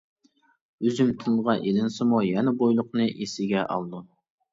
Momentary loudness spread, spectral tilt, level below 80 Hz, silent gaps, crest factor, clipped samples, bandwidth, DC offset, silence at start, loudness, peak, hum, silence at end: 7 LU; -6.5 dB/octave; -66 dBFS; none; 16 dB; under 0.1%; 7.8 kHz; under 0.1%; 0.8 s; -25 LUFS; -10 dBFS; none; 0.5 s